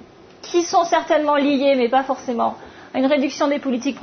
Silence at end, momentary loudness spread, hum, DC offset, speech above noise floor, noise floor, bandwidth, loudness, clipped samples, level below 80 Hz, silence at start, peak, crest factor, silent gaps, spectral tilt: 0 s; 7 LU; none; under 0.1%; 23 dB; -41 dBFS; 6.6 kHz; -19 LUFS; under 0.1%; -62 dBFS; 0.45 s; -4 dBFS; 14 dB; none; -3.5 dB/octave